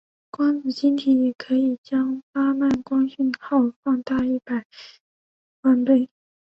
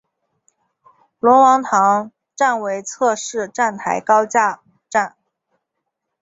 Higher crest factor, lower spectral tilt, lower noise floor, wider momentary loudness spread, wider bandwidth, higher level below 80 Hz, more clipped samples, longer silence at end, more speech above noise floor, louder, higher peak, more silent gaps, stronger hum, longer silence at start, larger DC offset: about the same, 16 dB vs 16 dB; first, -6.5 dB/octave vs -3.5 dB/octave; first, under -90 dBFS vs -77 dBFS; second, 7 LU vs 12 LU; second, 6.2 kHz vs 8 kHz; first, -60 dBFS vs -70 dBFS; neither; second, 0.45 s vs 1.15 s; first, over 69 dB vs 61 dB; second, -22 LUFS vs -17 LUFS; second, -6 dBFS vs -2 dBFS; first, 1.78-1.84 s, 2.23-2.34 s, 3.76-3.83 s, 4.65-4.70 s, 5.00-5.63 s vs none; neither; second, 0.4 s vs 1.25 s; neither